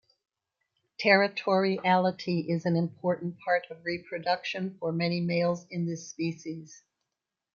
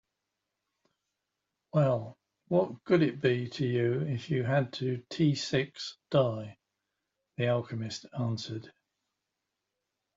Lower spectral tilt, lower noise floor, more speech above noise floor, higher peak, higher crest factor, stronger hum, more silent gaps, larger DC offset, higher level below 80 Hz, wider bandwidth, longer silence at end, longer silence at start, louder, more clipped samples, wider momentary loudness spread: about the same, -6 dB/octave vs -6.5 dB/octave; about the same, -87 dBFS vs -86 dBFS; about the same, 58 dB vs 56 dB; first, -8 dBFS vs -12 dBFS; about the same, 22 dB vs 20 dB; neither; neither; neither; about the same, -74 dBFS vs -70 dBFS; about the same, 7.2 kHz vs 7.8 kHz; second, 0.8 s vs 1.45 s; second, 1 s vs 1.75 s; first, -28 LUFS vs -31 LUFS; neither; about the same, 11 LU vs 12 LU